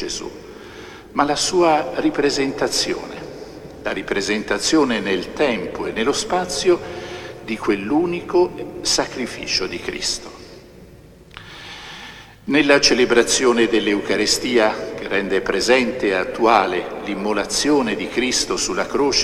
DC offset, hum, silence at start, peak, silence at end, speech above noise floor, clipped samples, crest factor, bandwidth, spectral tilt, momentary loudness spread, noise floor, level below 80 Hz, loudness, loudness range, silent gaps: under 0.1%; none; 0 s; 0 dBFS; 0 s; 25 dB; under 0.1%; 20 dB; 14.5 kHz; -2.5 dB/octave; 19 LU; -44 dBFS; -46 dBFS; -19 LUFS; 6 LU; none